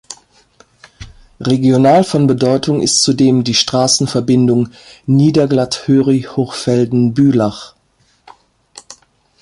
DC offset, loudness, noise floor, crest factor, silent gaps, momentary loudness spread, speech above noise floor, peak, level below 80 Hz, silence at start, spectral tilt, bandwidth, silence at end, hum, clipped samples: under 0.1%; -13 LUFS; -57 dBFS; 14 dB; none; 9 LU; 44 dB; 0 dBFS; -48 dBFS; 0.1 s; -5 dB/octave; 11.5 kHz; 0.5 s; none; under 0.1%